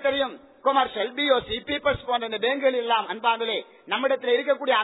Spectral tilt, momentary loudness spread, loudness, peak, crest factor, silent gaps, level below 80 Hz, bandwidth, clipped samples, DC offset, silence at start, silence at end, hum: -6.5 dB/octave; 6 LU; -24 LUFS; -8 dBFS; 16 dB; none; -54 dBFS; 4.1 kHz; under 0.1%; under 0.1%; 0 s; 0 s; none